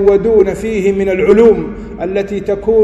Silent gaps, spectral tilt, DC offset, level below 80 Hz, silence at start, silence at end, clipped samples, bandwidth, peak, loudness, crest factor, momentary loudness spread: none; -7.5 dB/octave; under 0.1%; -34 dBFS; 0 s; 0 s; 0.6%; 11.5 kHz; 0 dBFS; -12 LUFS; 12 dB; 10 LU